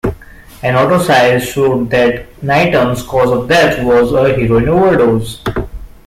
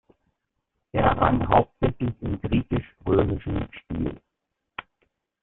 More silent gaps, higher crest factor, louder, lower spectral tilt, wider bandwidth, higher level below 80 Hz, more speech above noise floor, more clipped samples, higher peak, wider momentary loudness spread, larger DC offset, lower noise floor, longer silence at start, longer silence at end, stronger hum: neither; second, 12 dB vs 22 dB; first, -12 LUFS vs -25 LUFS; second, -6 dB/octave vs -11.5 dB/octave; first, 16 kHz vs 4.1 kHz; first, -32 dBFS vs -40 dBFS; second, 24 dB vs 58 dB; neither; first, 0 dBFS vs -4 dBFS; second, 11 LU vs 14 LU; neither; second, -35 dBFS vs -81 dBFS; second, 0.05 s vs 0.95 s; second, 0.2 s vs 0.6 s; neither